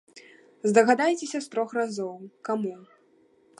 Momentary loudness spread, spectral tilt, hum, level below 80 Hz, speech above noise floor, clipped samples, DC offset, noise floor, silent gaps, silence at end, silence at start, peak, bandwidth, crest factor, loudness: 15 LU; -4.5 dB/octave; none; -80 dBFS; 36 dB; under 0.1%; under 0.1%; -62 dBFS; none; 0.75 s; 0.15 s; -6 dBFS; 11.5 kHz; 22 dB; -26 LUFS